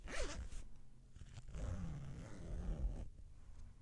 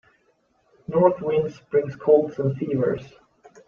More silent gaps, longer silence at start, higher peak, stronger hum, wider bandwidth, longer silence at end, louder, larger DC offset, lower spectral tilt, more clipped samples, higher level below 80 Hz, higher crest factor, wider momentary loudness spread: neither; second, 0 s vs 0.9 s; second, -30 dBFS vs -4 dBFS; neither; first, 11.5 kHz vs 6.8 kHz; second, 0 s vs 0.6 s; second, -50 LUFS vs -22 LUFS; neither; second, -5 dB/octave vs -9.5 dB/octave; neither; first, -48 dBFS vs -62 dBFS; about the same, 18 dB vs 20 dB; first, 16 LU vs 7 LU